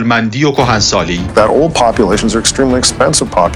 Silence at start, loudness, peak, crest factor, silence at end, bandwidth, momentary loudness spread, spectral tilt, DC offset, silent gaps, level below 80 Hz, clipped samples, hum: 0 s; -11 LUFS; 0 dBFS; 10 dB; 0 s; 16 kHz; 3 LU; -4 dB/octave; under 0.1%; none; -28 dBFS; under 0.1%; none